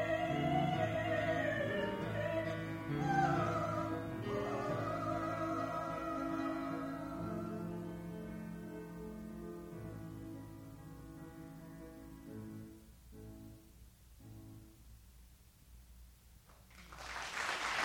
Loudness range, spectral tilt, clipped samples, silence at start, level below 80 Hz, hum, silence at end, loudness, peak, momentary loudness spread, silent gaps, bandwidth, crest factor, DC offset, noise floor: 20 LU; -6 dB/octave; under 0.1%; 0 s; -60 dBFS; none; 0 s; -39 LUFS; -22 dBFS; 21 LU; none; 20 kHz; 18 dB; under 0.1%; -62 dBFS